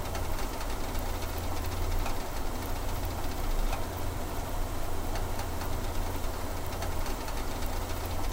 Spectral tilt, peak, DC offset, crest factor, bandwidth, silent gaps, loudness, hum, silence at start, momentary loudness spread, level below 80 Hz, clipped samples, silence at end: -4.5 dB/octave; -18 dBFS; under 0.1%; 12 dB; 16.5 kHz; none; -36 LUFS; none; 0 s; 2 LU; -34 dBFS; under 0.1%; 0 s